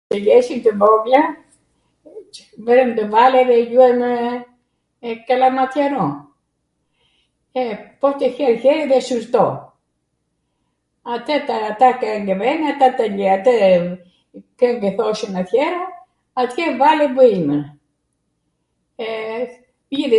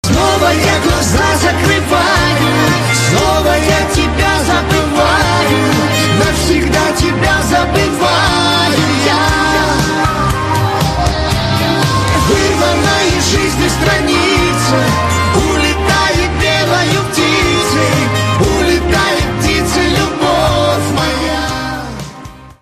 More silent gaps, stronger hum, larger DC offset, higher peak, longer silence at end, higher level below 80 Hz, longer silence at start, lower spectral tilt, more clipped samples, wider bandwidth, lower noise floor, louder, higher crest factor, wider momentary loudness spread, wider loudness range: neither; neither; second, under 0.1% vs 0.2%; about the same, 0 dBFS vs 0 dBFS; about the same, 0 s vs 0.1 s; second, -66 dBFS vs -24 dBFS; about the same, 0.1 s vs 0.05 s; first, -6 dB/octave vs -4.5 dB/octave; neither; second, 11.5 kHz vs 14 kHz; first, -71 dBFS vs -32 dBFS; second, -16 LUFS vs -11 LUFS; first, 18 dB vs 12 dB; first, 16 LU vs 3 LU; first, 5 LU vs 1 LU